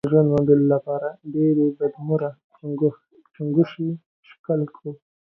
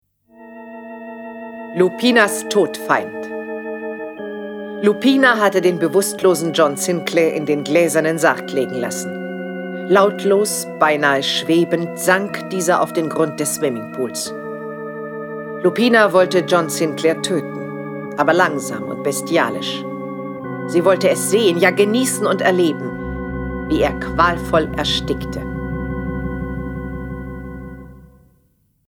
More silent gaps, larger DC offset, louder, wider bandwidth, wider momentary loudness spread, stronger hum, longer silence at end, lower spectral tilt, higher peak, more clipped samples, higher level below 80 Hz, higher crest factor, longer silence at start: first, 2.44-2.50 s, 4.06-4.23 s, 4.39-4.44 s vs none; neither; second, -22 LUFS vs -18 LUFS; second, 5.6 kHz vs 18.5 kHz; about the same, 17 LU vs 15 LU; neither; second, 0.3 s vs 0.85 s; first, -11 dB/octave vs -4 dB/octave; second, -4 dBFS vs 0 dBFS; neither; second, -60 dBFS vs -40 dBFS; about the same, 18 dB vs 18 dB; second, 0.05 s vs 0.4 s